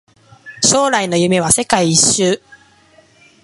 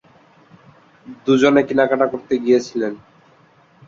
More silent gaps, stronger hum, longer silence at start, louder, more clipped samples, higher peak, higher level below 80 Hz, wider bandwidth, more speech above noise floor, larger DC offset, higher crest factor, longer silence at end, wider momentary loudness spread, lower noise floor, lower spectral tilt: neither; neither; second, 0.45 s vs 1.05 s; first, -13 LUFS vs -17 LUFS; neither; about the same, 0 dBFS vs -2 dBFS; first, -48 dBFS vs -60 dBFS; first, 12 kHz vs 7.6 kHz; about the same, 36 dB vs 36 dB; neither; about the same, 16 dB vs 18 dB; first, 1.05 s vs 0.9 s; second, 5 LU vs 13 LU; about the same, -49 dBFS vs -52 dBFS; second, -3 dB/octave vs -5.5 dB/octave